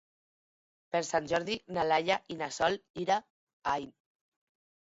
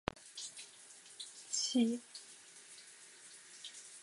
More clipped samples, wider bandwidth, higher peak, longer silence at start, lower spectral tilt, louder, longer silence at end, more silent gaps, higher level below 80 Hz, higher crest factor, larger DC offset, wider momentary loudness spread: neither; second, 8 kHz vs 11.5 kHz; about the same, -14 dBFS vs -14 dBFS; first, 0.95 s vs 0.15 s; about the same, -3.5 dB/octave vs -2.5 dB/octave; first, -32 LUFS vs -40 LUFS; first, 0.95 s vs 0 s; first, 2.90-2.94 s, 3.30-3.47 s, 3.53-3.62 s vs none; about the same, -68 dBFS vs -70 dBFS; second, 20 dB vs 30 dB; neither; second, 7 LU vs 20 LU